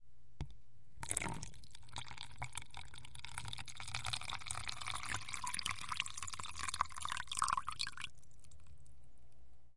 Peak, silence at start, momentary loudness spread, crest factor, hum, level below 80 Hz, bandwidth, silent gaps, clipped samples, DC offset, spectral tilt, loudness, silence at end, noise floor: -16 dBFS; 0 s; 13 LU; 30 dB; none; -60 dBFS; 11.5 kHz; none; under 0.1%; 0.6%; -1 dB/octave; -43 LUFS; 0 s; -65 dBFS